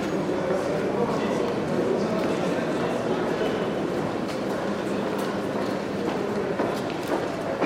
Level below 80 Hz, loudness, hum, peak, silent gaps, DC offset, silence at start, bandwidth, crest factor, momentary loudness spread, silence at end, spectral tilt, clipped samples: -56 dBFS; -26 LUFS; none; -10 dBFS; none; under 0.1%; 0 s; 16 kHz; 16 dB; 3 LU; 0 s; -6 dB/octave; under 0.1%